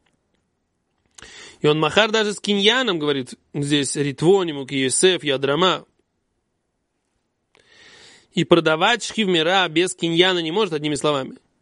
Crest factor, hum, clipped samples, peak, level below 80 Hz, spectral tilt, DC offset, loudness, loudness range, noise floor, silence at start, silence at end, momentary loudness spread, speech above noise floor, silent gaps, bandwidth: 22 dB; none; under 0.1%; 0 dBFS; -62 dBFS; -3.5 dB/octave; under 0.1%; -19 LUFS; 5 LU; -73 dBFS; 1.2 s; 0.25 s; 9 LU; 54 dB; none; 11.5 kHz